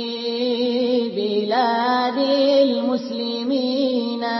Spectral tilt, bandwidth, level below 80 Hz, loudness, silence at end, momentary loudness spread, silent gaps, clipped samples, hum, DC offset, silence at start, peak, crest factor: -5.5 dB/octave; 6 kHz; -78 dBFS; -20 LUFS; 0 s; 7 LU; none; under 0.1%; none; under 0.1%; 0 s; -6 dBFS; 14 dB